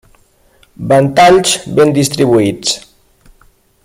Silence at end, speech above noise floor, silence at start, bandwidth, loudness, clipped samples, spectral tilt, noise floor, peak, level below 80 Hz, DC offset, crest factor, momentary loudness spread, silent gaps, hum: 1.05 s; 40 dB; 0.8 s; 16 kHz; -10 LUFS; under 0.1%; -4.5 dB/octave; -50 dBFS; 0 dBFS; -46 dBFS; under 0.1%; 12 dB; 10 LU; none; none